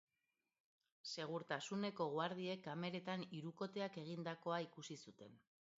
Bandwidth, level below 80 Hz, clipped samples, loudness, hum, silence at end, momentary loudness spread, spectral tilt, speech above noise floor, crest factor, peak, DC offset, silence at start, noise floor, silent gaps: 7.6 kHz; under -90 dBFS; under 0.1%; -47 LUFS; none; 0.4 s; 12 LU; -4 dB/octave; over 43 dB; 20 dB; -28 dBFS; under 0.1%; 1.05 s; under -90 dBFS; none